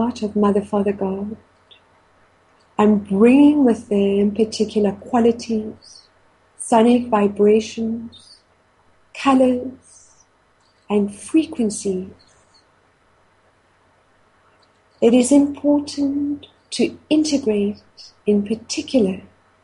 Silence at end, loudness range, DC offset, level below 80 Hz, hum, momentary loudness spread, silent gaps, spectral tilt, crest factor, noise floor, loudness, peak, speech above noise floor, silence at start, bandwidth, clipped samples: 0.45 s; 8 LU; under 0.1%; -58 dBFS; none; 15 LU; none; -5.5 dB/octave; 18 dB; -58 dBFS; -18 LUFS; -2 dBFS; 41 dB; 0 s; 11.5 kHz; under 0.1%